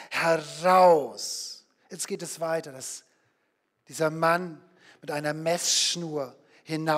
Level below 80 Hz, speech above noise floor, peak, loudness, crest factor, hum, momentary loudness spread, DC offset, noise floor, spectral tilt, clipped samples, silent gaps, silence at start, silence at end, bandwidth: -80 dBFS; 48 dB; -8 dBFS; -26 LUFS; 20 dB; none; 20 LU; under 0.1%; -74 dBFS; -3 dB/octave; under 0.1%; none; 0 s; 0 s; 16 kHz